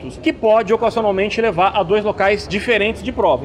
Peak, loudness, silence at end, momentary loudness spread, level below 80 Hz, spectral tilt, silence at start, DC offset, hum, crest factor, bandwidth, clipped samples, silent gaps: -4 dBFS; -17 LUFS; 0 s; 4 LU; -40 dBFS; -5.5 dB/octave; 0 s; under 0.1%; none; 12 dB; 11 kHz; under 0.1%; none